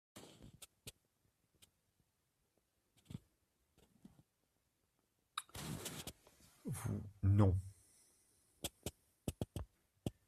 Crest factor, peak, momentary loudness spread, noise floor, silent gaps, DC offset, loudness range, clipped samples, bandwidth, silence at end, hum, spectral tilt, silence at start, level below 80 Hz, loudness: 26 dB; -20 dBFS; 23 LU; -83 dBFS; none; under 0.1%; 23 LU; under 0.1%; 15 kHz; 0.15 s; none; -6 dB/octave; 0.15 s; -64 dBFS; -42 LUFS